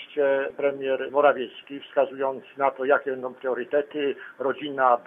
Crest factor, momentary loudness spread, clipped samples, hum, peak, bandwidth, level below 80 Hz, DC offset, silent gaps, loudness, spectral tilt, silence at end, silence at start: 20 dB; 9 LU; under 0.1%; none; -6 dBFS; 3.7 kHz; -78 dBFS; under 0.1%; none; -25 LUFS; -7 dB/octave; 0.05 s; 0 s